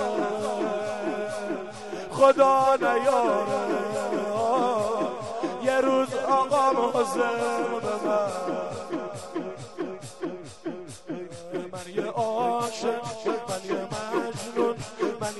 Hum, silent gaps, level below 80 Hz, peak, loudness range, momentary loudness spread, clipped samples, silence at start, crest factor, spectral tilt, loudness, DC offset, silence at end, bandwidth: none; none; -64 dBFS; -6 dBFS; 10 LU; 14 LU; under 0.1%; 0 s; 20 dB; -4.5 dB/octave; -26 LUFS; 0.3%; 0 s; 12 kHz